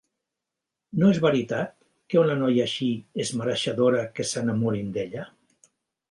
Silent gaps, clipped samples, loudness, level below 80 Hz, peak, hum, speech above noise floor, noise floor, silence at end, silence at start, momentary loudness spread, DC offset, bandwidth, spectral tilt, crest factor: none; under 0.1%; -25 LUFS; -64 dBFS; -8 dBFS; none; 62 dB; -86 dBFS; 0.85 s; 0.95 s; 11 LU; under 0.1%; 11.5 kHz; -5.5 dB/octave; 18 dB